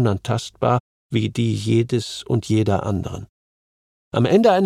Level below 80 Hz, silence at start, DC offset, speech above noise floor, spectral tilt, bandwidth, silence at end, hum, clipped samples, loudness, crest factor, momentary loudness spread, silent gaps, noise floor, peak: -50 dBFS; 0 s; under 0.1%; over 71 dB; -6.5 dB/octave; 12 kHz; 0 s; none; under 0.1%; -21 LUFS; 16 dB; 9 LU; 0.80-1.10 s, 3.29-4.11 s; under -90 dBFS; -4 dBFS